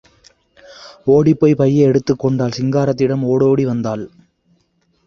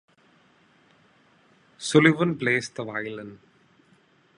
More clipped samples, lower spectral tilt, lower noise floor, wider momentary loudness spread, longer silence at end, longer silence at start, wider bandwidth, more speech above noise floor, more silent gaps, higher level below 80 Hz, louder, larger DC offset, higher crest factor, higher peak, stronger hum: neither; first, -8 dB/octave vs -5.5 dB/octave; about the same, -62 dBFS vs -61 dBFS; second, 10 LU vs 18 LU; about the same, 1 s vs 1 s; second, 0.7 s vs 1.8 s; second, 7 kHz vs 11.5 kHz; first, 47 dB vs 37 dB; neither; first, -50 dBFS vs -70 dBFS; first, -15 LUFS vs -23 LUFS; neither; second, 14 dB vs 24 dB; about the same, -2 dBFS vs -4 dBFS; neither